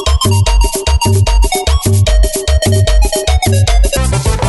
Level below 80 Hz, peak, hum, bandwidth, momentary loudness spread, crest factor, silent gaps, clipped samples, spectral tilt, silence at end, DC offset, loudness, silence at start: -12 dBFS; 0 dBFS; none; 12 kHz; 2 LU; 10 dB; none; under 0.1%; -4.5 dB/octave; 0 s; 0.3%; -12 LUFS; 0 s